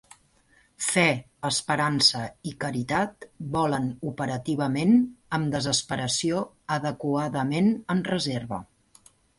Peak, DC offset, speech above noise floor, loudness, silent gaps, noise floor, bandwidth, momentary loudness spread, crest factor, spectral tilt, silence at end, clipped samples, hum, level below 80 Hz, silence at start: -6 dBFS; under 0.1%; 36 dB; -26 LUFS; none; -62 dBFS; 11.5 kHz; 10 LU; 20 dB; -4 dB/octave; 0.75 s; under 0.1%; none; -58 dBFS; 0.8 s